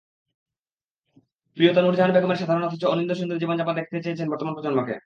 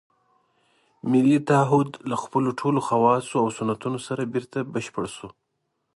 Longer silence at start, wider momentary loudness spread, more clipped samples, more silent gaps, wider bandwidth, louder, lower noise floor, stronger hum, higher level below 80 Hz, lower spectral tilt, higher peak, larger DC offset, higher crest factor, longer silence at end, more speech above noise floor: first, 1.55 s vs 1.05 s; second, 9 LU vs 12 LU; neither; neither; second, 7.2 kHz vs 11.5 kHz; about the same, -23 LUFS vs -24 LUFS; first, under -90 dBFS vs -76 dBFS; neither; second, -72 dBFS vs -64 dBFS; about the same, -7.5 dB/octave vs -6.5 dB/octave; about the same, -4 dBFS vs -6 dBFS; neither; about the same, 20 dB vs 18 dB; second, 0.05 s vs 0.65 s; first, over 68 dB vs 53 dB